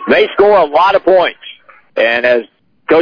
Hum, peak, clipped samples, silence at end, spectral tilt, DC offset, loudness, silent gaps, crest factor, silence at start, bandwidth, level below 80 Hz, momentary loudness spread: none; -2 dBFS; under 0.1%; 0 s; -6 dB/octave; under 0.1%; -11 LUFS; none; 10 dB; 0 s; 5.4 kHz; -50 dBFS; 13 LU